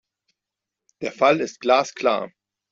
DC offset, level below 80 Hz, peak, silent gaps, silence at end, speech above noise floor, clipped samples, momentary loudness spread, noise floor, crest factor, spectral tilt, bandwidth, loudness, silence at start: under 0.1%; -68 dBFS; -4 dBFS; none; 0.45 s; 65 dB; under 0.1%; 13 LU; -86 dBFS; 20 dB; -4 dB/octave; 7.8 kHz; -21 LUFS; 1 s